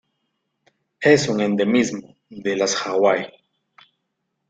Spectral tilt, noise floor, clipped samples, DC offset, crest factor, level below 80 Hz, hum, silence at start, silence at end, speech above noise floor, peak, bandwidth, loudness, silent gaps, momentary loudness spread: -4.5 dB/octave; -76 dBFS; under 0.1%; under 0.1%; 20 dB; -62 dBFS; none; 1 s; 1.2 s; 57 dB; -2 dBFS; 9.4 kHz; -20 LUFS; none; 11 LU